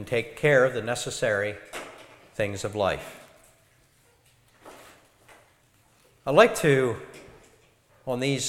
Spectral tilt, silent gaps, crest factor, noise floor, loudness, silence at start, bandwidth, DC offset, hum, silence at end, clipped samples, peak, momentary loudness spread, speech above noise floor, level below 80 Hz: -4.5 dB/octave; none; 24 dB; -62 dBFS; -24 LUFS; 0 s; 16.5 kHz; under 0.1%; none; 0 s; under 0.1%; -4 dBFS; 21 LU; 38 dB; -58 dBFS